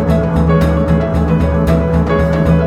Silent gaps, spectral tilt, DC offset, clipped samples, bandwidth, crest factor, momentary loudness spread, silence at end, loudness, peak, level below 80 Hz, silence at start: none; -9 dB/octave; under 0.1%; under 0.1%; 9.6 kHz; 10 dB; 2 LU; 0 s; -13 LUFS; 0 dBFS; -20 dBFS; 0 s